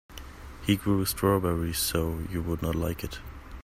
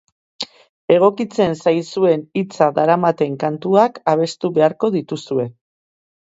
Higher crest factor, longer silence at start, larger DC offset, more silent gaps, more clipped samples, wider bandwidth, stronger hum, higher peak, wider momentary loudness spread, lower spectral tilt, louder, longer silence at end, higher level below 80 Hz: about the same, 18 dB vs 18 dB; second, 0.1 s vs 0.4 s; neither; second, none vs 0.69-0.88 s; neither; first, 16 kHz vs 8 kHz; neither; second, -10 dBFS vs 0 dBFS; first, 19 LU vs 13 LU; second, -5 dB/octave vs -6.5 dB/octave; second, -28 LUFS vs -17 LUFS; second, 0 s vs 0.8 s; first, -42 dBFS vs -62 dBFS